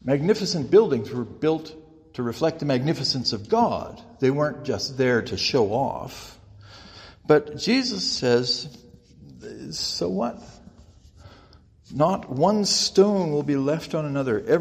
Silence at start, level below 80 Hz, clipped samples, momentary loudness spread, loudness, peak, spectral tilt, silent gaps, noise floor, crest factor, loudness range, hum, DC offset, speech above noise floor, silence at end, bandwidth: 0.05 s; -56 dBFS; under 0.1%; 19 LU; -23 LUFS; -4 dBFS; -5 dB/octave; none; -53 dBFS; 20 dB; 5 LU; none; under 0.1%; 30 dB; 0 s; 15.5 kHz